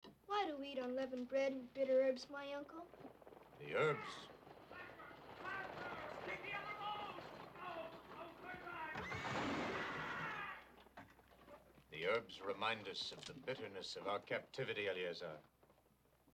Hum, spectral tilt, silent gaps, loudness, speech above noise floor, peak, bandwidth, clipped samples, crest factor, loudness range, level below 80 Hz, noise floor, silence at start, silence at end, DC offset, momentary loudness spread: none; -4.5 dB/octave; none; -44 LUFS; 31 dB; -26 dBFS; 15 kHz; under 0.1%; 20 dB; 6 LU; -76 dBFS; -74 dBFS; 0.05 s; 0.65 s; under 0.1%; 18 LU